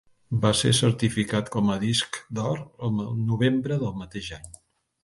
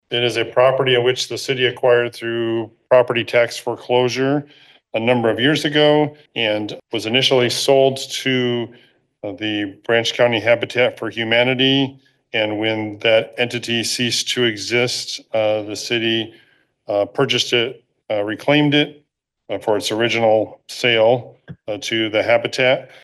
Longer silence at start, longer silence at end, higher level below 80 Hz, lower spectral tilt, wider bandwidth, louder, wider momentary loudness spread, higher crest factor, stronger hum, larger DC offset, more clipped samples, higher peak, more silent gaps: first, 0.3 s vs 0.1 s; first, 0.55 s vs 0.2 s; first, -52 dBFS vs -66 dBFS; about the same, -5 dB/octave vs -4 dB/octave; about the same, 11.5 kHz vs 12.5 kHz; second, -25 LUFS vs -18 LUFS; first, 14 LU vs 10 LU; about the same, 20 dB vs 16 dB; neither; neither; neither; second, -6 dBFS vs -2 dBFS; neither